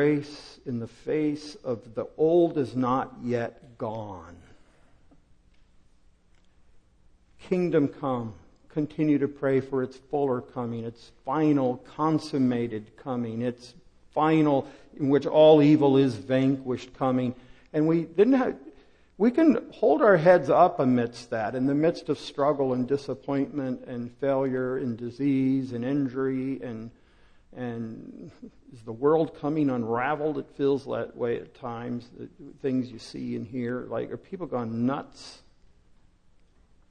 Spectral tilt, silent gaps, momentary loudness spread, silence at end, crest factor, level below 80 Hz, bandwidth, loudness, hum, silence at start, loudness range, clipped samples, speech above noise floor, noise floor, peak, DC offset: -8 dB/octave; none; 16 LU; 1.55 s; 20 dB; -60 dBFS; 9.8 kHz; -26 LUFS; none; 0 s; 11 LU; under 0.1%; 33 dB; -59 dBFS; -6 dBFS; under 0.1%